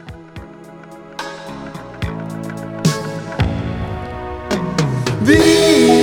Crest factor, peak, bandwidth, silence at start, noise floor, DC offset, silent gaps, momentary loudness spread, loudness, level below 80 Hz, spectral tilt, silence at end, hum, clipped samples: 18 dB; 0 dBFS; 18.5 kHz; 0 s; -37 dBFS; under 0.1%; none; 25 LU; -17 LUFS; -36 dBFS; -5 dB/octave; 0 s; none; under 0.1%